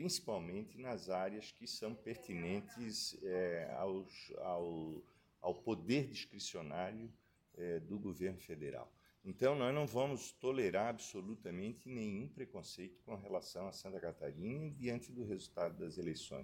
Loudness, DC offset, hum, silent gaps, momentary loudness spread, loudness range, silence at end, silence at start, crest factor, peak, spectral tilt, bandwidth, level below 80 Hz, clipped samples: -43 LUFS; under 0.1%; none; none; 12 LU; 6 LU; 0 s; 0 s; 20 dB; -22 dBFS; -5 dB/octave; 16.5 kHz; -74 dBFS; under 0.1%